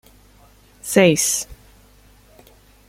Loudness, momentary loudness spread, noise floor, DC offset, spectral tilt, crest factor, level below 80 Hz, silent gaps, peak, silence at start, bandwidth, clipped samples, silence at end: -17 LUFS; 21 LU; -51 dBFS; under 0.1%; -3.5 dB/octave; 22 dB; -52 dBFS; none; -2 dBFS; 0.85 s; 16.5 kHz; under 0.1%; 1.35 s